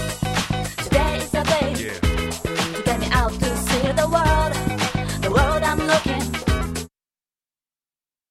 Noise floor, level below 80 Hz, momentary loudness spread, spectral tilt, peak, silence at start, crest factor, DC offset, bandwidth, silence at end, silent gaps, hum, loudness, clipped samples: under -90 dBFS; -30 dBFS; 6 LU; -4.5 dB/octave; -4 dBFS; 0 s; 18 dB; under 0.1%; 16 kHz; 1.45 s; none; none; -21 LUFS; under 0.1%